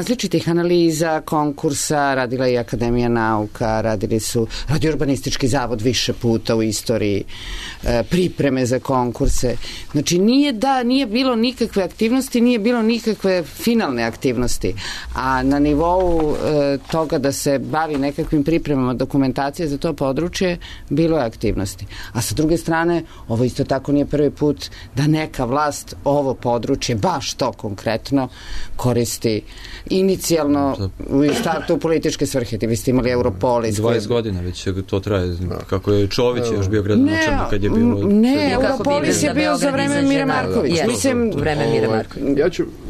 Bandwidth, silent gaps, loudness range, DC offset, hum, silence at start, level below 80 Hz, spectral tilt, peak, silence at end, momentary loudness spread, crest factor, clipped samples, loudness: 13.5 kHz; none; 4 LU; under 0.1%; none; 0 s; -34 dBFS; -5.5 dB/octave; -6 dBFS; 0 s; 7 LU; 12 dB; under 0.1%; -19 LUFS